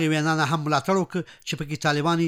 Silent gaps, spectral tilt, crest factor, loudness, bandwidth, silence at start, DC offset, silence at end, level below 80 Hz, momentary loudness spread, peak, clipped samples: none; -5.5 dB/octave; 16 dB; -24 LUFS; 15.5 kHz; 0 s; under 0.1%; 0 s; -56 dBFS; 9 LU; -8 dBFS; under 0.1%